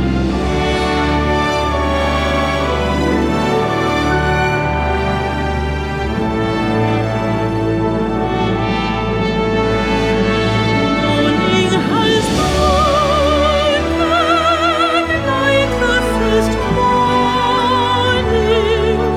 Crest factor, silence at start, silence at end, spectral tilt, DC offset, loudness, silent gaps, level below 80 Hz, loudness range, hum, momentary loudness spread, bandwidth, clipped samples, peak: 12 dB; 0 s; 0 s; -5.5 dB/octave; under 0.1%; -15 LUFS; none; -26 dBFS; 4 LU; none; 4 LU; 15 kHz; under 0.1%; -2 dBFS